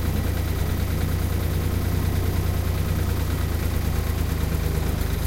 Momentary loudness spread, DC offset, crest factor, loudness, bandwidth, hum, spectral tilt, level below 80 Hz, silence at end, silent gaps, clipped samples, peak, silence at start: 1 LU; under 0.1%; 12 dB; -25 LUFS; 16 kHz; none; -6 dB/octave; -28 dBFS; 0 s; none; under 0.1%; -10 dBFS; 0 s